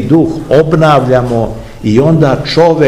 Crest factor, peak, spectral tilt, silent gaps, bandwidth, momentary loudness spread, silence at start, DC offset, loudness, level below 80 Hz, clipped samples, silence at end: 8 dB; 0 dBFS; -7.5 dB/octave; none; 12 kHz; 7 LU; 0 s; 0.8%; -9 LUFS; -32 dBFS; 3%; 0 s